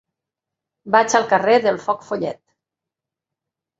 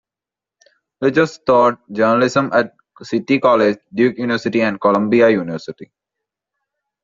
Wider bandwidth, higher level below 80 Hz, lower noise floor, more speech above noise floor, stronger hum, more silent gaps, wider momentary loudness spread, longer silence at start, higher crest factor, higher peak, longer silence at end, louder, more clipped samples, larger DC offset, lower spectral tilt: about the same, 8 kHz vs 7.6 kHz; second, -68 dBFS vs -60 dBFS; about the same, -86 dBFS vs -88 dBFS; second, 68 dB vs 72 dB; neither; neither; about the same, 10 LU vs 10 LU; second, 0.85 s vs 1 s; first, 20 dB vs 14 dB; about the same, -2 dBFS vs -2 dBFS; first, 1.45 s vs 1.2 s; about the same, -18 LUFS vs -16 LUFS; neither; neither; about the same, -3.5 dB/octave vs -4.5 dB/octave